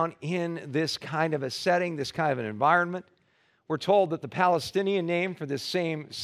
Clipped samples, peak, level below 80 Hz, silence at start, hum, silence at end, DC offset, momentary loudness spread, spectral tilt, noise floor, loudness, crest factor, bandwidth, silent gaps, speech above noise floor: under 0.1%; -8 dBFS; -68 dBFS; 0 s; none; 0 s; under 0.1%; 8 LU; -5.5 dB/octave; -67 dBFS; -27 LUFS; 20 dB; 15.5 kHz; none; 40 dB